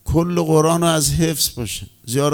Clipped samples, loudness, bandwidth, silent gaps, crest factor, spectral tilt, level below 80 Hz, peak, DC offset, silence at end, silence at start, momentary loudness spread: under 0.1%; -18 LUFS; over 20 kHz; none; 16 dB; -4.5 dB/octave; -36 dBFS; -2 dBFS; under 0.1%; 0 s; 0.05 s; 11 LU